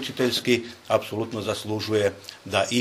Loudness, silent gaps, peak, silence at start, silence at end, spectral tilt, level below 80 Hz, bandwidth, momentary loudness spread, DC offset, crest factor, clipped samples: -25 LUFS; none; -6 dBFS; 0 s; 0 s; -4 dB/octave; -62 dBFS; 15.5 kHz; 6 LU; under 0.1%; 20 dB; under 0.1%